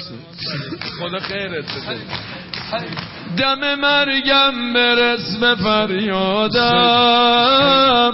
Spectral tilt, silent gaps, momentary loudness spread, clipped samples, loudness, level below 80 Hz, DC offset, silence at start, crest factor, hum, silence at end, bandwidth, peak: -7.5 dB/octave; none; 15 LU; under 0.1%; -15 LUFS; -48 dBFS; under 0.1%; 0 s; 12 dB; none; 0 s; 6 kHz; -4 dBFS